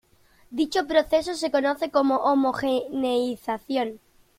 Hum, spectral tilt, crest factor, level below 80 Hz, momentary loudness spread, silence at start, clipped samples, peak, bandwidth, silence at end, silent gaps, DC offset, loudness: none; -4 dB/octave; 18 dB; -58 dBFS; 7 LU; 0.5 s; under 0.1%; -6 dBFS; 15.5 kHz; 0.4 s; none; under 0.1%; -24 LUFS